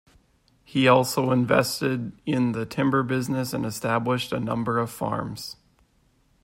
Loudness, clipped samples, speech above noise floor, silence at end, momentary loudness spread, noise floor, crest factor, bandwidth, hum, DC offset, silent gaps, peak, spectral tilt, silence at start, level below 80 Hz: -24 LUFS; under 0.1%; 40 dB; 0.9 s; 10 LU; -64 dBFS; 20 dB; 16.5 kHz; none; under 0.1%; none; -6 dBFS; -5.5 dB/octave; 0.7 s; -58 dBFS